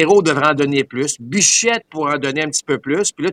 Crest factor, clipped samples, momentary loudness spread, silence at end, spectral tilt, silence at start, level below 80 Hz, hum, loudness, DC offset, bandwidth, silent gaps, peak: 16 dB; under 0.1%; 8 LU; 0 s; -3 dB/octave; 0 s; -60 dBFS; none; -16 LUFS; under 0.1%; 15 kHz; none; 0 dBFS